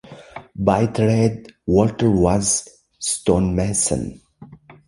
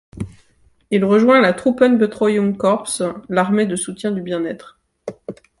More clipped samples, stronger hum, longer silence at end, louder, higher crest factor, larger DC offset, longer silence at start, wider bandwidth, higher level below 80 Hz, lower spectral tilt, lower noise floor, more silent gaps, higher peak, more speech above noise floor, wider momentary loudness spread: neither; neither; about the same, 0.35 s vs 0.25 s; about the same, -19 LUFS vs -17 LUFS; about the same, 18 dB vs 16 dB; neither; about the same, 0.1 s vs 0.15 s; about the same, 11.5 kHz vs 11.5 kHz; first, -38 dBFS vs -52 dBFS; about the same, -5.5 dB/octave vs -5.5 dB/octave; second, -44 dBFS vs -56 dBFS; neither; about the same, -2 dBFS vs -2 dBFS; second, 25 dB vs 40 dB; second, 14 LU vs 20 LU